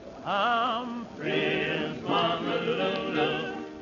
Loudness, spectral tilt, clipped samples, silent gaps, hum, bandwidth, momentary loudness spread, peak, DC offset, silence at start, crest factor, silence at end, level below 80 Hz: -28 LUFS; -5.5 dB/octave; under 0.1%; none; none; 7.4 kHz; 7 LU; -14 dBFS; under 0.1%; 0 s; 14 dB; 0 s; -62 dBFS